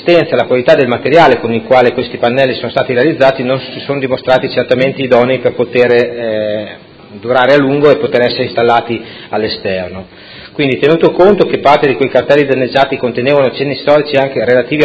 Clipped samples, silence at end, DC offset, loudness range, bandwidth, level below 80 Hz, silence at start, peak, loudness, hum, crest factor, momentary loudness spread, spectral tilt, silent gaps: 0.9%; 0 s; under 0.1%; 2 LU; 8 kHz; -46 dBFS; 0 s; 0 dBFS; -11 LUFS; none; 10 dB; 10 LU; -7 dB/octave; none